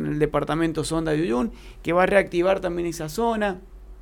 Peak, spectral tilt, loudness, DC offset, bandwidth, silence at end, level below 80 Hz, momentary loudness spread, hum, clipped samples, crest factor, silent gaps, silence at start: -6 dBFS; -5.5 dB/octave; -23 LUFS; under 0.1%; 17.5 kHz; 0 s; -42 dBFS; 9 LU; none; under 0.1%; 18 dB; none; 0 s